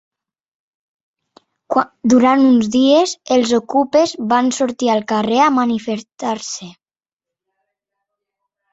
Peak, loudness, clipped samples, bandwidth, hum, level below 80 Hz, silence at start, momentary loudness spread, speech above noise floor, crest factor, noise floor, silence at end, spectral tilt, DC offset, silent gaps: -2 dBFS; -15 LUFS; under 0.1%; 8 kHz; none; -60 dBFS; 1.7 s; 11 LU; over 75 dB; 16 dB; under -90 dBFS; 2 s; -4 dB/octave; under 0.1%; none